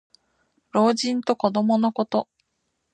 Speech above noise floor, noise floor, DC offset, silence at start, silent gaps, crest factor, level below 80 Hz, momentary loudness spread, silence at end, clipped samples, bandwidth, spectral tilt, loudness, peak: 54 dB; -75 dBFS; under 0.1%; 0.75 s; none; 20 dB; -72 dBFS; 7 LU; 0.7 s; under 0.1%; 9.6 kHz; -5.5 dB/octave; -22 LUFS; -4 dBFS